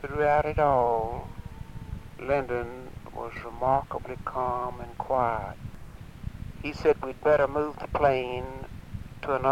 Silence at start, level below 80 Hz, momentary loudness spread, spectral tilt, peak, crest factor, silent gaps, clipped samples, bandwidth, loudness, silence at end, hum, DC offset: 0 s; -44 dBFS; 18 LU; -7 dB/octave; -8 dBFS; 20 dB; none; under 0.1%; 16 kHz; -28 LUFS; 0 s; none; 0.2%